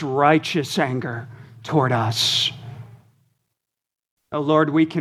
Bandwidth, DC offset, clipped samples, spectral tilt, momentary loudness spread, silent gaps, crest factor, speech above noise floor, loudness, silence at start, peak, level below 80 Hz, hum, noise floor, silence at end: 15 kHz; under 0.1%; under 0.1%; -5 dB/octave; 21 LU; 4.11-4.17 s; 20 dB; 66 dB; -20 LUFS; 0 s; -2 dBFS; -66 dBFS; none; -86 dBFS; 0 s